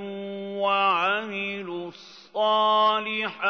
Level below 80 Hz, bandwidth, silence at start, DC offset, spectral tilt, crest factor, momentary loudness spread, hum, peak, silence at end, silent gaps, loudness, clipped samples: -80 dBFS; 6.6 kHz; 0 s; under 0.1%; -5 dB/octave; 14 dB; 14 LU; none; -10 dBFS; 0 s; none; -24 LUFS; under 0.1%